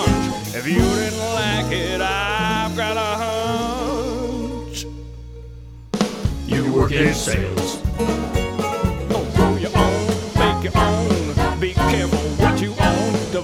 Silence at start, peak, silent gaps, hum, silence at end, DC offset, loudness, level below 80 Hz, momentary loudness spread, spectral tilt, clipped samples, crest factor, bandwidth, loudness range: 0 s; -2 dBFS; none; none; 0 s; under 0.1%; -20 LUFS; -30 dBFS; 9 LU; -5 dB/octave; under 0.1%; 18 dB; 17 kHz; 6 LU